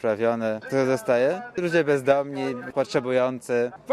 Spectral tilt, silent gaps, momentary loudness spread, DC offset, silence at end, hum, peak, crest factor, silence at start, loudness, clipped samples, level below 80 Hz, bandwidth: -6 dB/octave; none; 7 LU; under 0.1%; 0 s; none; -6 dBFS; 16 dB; 0.05 s; -24 LUFS; under 0.1%; -66 dBFS; 14.5 kHz